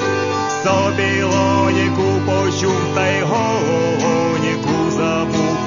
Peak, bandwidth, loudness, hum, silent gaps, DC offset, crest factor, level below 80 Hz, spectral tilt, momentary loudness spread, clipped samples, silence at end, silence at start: -2 dBFS; 7.4 kHz; -17 LUFS; none; none; under 0.1%; 14 dB; -48 dBFS; -5.5 dB/octave; 3 LU; under 0.1%; 0 s; 0 s